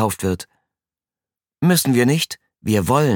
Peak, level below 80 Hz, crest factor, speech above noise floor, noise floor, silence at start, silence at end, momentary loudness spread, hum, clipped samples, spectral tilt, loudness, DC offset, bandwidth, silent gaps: -2 dBFS; -50 dBFS; 18 dB; over 73 dB; under -90 dBFS; 0 s; 0 s; 13 LU; none; under 0.1%; -5 dB/octave; -19 LUFS; under 0.1%; 19 kHz; none